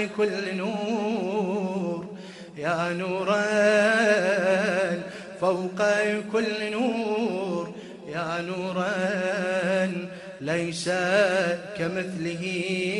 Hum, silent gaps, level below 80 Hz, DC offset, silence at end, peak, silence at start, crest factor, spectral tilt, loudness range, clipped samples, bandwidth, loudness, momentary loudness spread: none; none; -68 dBFS; under 0.1%; 0 s; -10 dBFS; 0 s; 16 dB; -5 dB/octave; 5 LU; under 0.1%; 11.5 kHz; -26 LUFS; 11 LU